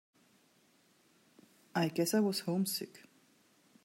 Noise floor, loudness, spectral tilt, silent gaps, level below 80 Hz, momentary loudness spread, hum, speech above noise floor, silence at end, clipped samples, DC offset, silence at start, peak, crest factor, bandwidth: -69 dBFS; -34 LUFS; -4.5 dB/octave; none; -88 dBFS; 9 LU; none; 36 dB; 0.85 s; under 0.1%; under 0.1%; 1.75 s; -20 dBFS; 18 dB; 16 kHz